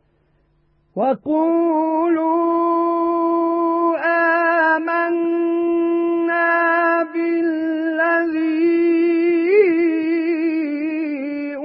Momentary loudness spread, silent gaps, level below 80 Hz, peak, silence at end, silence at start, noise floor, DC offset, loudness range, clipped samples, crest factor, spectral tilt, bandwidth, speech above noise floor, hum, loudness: 6 LU; none; -68 dBFS; -4 dBFS; 0 s; 0.95 s; -61 dBFS; under 0.1%; 1 LU; under 0.1%; 14 dB; -10 dB/octave; 5 kHz; 43 dB; none; -18 LUFS